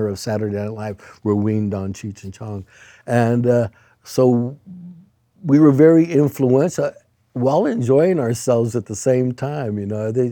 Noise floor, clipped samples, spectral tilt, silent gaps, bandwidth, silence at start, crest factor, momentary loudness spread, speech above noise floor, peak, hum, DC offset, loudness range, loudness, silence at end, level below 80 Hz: -49 dBFS; under 0.1%; -7.5 dB/octave; none; 19 kHz; 0 s; 18 dB; 18 LU; 31 dB; -2 dBFS; none; under 0.1%; 6 LU; -18 LUFS; 0 s; -60 dBFS